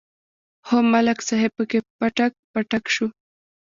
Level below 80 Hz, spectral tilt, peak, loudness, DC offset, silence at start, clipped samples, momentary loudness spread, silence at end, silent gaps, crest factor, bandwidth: -64 dBFS; -4 dB/octave; -4 dBFS; -22 LUFS; under 0.1%; 0.65 s; under 0.1%; 7 LU; 0.5 s; 1.90-1.99 s, 2.39-2.54 s; 18 dB; 7.6 kHz